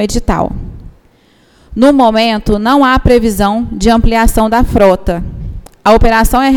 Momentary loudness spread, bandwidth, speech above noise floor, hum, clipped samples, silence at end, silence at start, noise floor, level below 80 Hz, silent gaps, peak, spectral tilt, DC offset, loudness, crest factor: 14 LU; 19 kHz; 39 dB; none; 0.1%; 0 s; 0 s; -48 dBFS; -18 dBFS; none; 0 dBFS; -5.5 dB/octave; under 0.1%; -10 LUFS; 10 dB